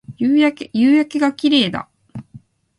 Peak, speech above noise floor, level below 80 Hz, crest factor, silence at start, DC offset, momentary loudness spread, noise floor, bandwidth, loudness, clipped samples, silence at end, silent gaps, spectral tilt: -2 dBFS; 29 dB; -58 dBFS; 16 dB; 0.1 s; under 0.1%; 22 LU; -44 dBFS; 11.5 kHz; -16 LUFS; under 0.1%; 0.4 s; none; -5.5 dB/octave